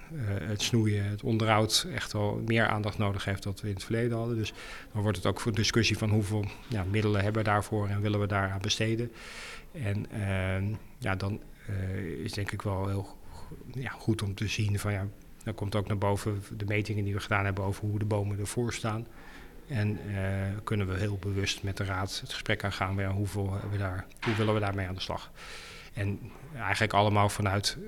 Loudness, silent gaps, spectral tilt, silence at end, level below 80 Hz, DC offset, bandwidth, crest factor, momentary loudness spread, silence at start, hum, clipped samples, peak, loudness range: -31 LUFS; none; -5 dB/octave; 0 s; -52 dBFS; under 0.1%; 14.5 kHz; 22 dB; 12 LU; 0 s; none; under 0.1%; -10 dBFS; 5 LU